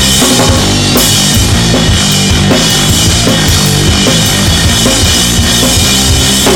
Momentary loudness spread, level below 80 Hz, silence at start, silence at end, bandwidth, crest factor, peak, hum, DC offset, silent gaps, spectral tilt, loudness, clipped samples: 2 LU; -18 dBFS; 0 s; 0 s; 18.5 kHz; 8 dB; 0 dBFS; none; under 0.1%; none; -3 dB/octave; -6 LUFS; under 0.1%